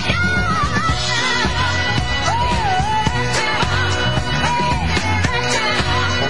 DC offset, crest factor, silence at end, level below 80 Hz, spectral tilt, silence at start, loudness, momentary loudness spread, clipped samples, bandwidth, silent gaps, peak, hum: 4%; 14 dB; 0 s; -30 dBFS; -4 dB/octave; 0 s; -17 LUFS; 1 LU; under 0.1%; 11.5 kHz; none; -4 dBFS; none